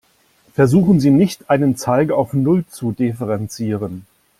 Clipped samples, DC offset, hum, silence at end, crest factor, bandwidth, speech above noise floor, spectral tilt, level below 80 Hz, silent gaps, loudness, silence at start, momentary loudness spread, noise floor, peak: under 0.1%; under 0.1%; none; 0.4 s; 14 dB; 15 kHz; 40 dB; -7.5 dB/octave; -50 dBFS; none; -17 LUFS; 0.6 s; 12 LU; -56 dBFS; -2 dBFS